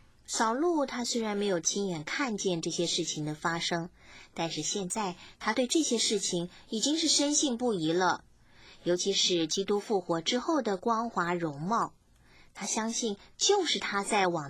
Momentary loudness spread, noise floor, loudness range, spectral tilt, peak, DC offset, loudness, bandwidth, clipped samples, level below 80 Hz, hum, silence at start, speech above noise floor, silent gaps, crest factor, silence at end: 9 LU; -59 dBFS; 4 LU; -3 dB/octave; -14 dBFS; under 0.1%; -30 LUFS; 16 kHz; under 0.1%; -66 dBFS; none; 0.3 s; 29 dB; none; 16 dB; 0 s